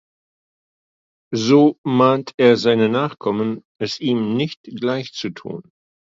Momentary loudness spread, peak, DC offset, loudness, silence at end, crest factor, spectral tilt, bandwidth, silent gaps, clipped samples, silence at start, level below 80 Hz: 14 LU; -2 dBFS; under 0.1%; -18 LUFS; 0.55 s; 18 dB; -6 dB/octave; 7.6 kHz; 1.78-1.84 s, 2.34-2.38 s, 3.65-3.75 s, 4.57-4.64 s; under 0.1%; 1.3 s; -64 dBFS